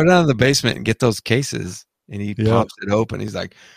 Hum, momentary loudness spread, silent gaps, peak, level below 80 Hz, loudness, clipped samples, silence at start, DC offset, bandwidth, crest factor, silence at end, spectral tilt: none; 14 LU; none; -2 dBFS; -46 dBFS; -19 LUFS; under 0.1%; 0 s; under 0.1%; 15.5 kHz; 18 dB; 0.3 s; -5 dB/octave